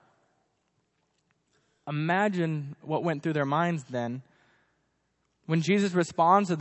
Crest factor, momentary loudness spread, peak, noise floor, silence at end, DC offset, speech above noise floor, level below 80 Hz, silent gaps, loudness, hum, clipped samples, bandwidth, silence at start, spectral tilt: 22 dB; 14 LU; -8 dBFS; -75 dBFS; 0 s; under 0.1%; 48 dB; -76 dBFS; none; -27 LUFS; none; under 0.1%; 8.4 kHz; 1.85 s; -6.5 dB/octave